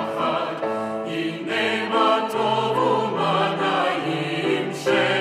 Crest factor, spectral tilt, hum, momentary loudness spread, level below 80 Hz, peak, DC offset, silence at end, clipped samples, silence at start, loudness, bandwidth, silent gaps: 16 dB; -5 dB/octave; none; 7 LU; -70 dBFS; -6 dBFS; under 0.1%; 0 s; under 0.1%; 0 s; -22 LUFS; 15.5 kHz; none